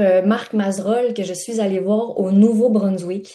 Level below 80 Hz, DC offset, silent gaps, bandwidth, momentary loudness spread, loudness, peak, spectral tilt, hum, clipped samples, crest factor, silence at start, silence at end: -68 dBFS; under 0.1%; none; 12.5 kHz; 8 LU; -18 LUFS; -4 dBFS; -6.5 dB/octave; none; under 0.1%; 14 dB; 0 s; 0 s